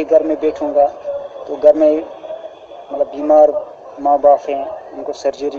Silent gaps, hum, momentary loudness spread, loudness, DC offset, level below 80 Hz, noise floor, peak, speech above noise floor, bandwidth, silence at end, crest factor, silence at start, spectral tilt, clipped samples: none; none; 18 LU; -15 LUFS; under 0.1%; -56 dBFS; -34 dBFS; 0 dBFS; 20 dB; 7 kHz; 0 s; 16 dB; 0 s; -5.5 dB/octave; under 0.1%